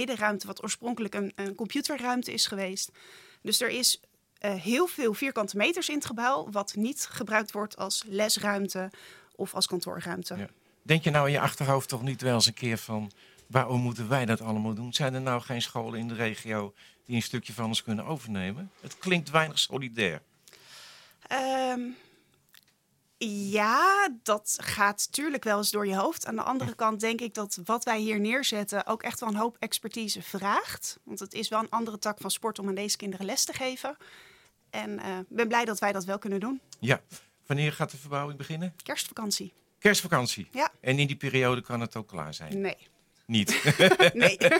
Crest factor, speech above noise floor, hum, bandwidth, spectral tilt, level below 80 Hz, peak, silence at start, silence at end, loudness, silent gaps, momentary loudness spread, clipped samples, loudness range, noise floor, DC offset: 26 dB; 41 dB; none; 17 kHz; -3.5 dB/octave; -70 dBFS; -2 dBFS; 0 s; 0 s; -29 LUFS; none; 11 LU; under 0.1%; 5 LU; -70 dBFS; under 0.1%